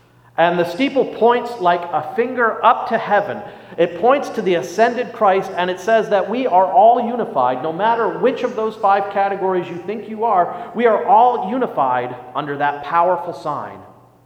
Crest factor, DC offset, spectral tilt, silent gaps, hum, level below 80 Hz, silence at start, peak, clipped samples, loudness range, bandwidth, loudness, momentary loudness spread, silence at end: 16 dB; under 0.1%; -5.5 dB/octave; none; none; -64 dBFS; 0.4 s; 0 dBFS; under 0.1%; 2 LU; 14.5 kHz; -17 LUFS; 12 LU; 0.4 s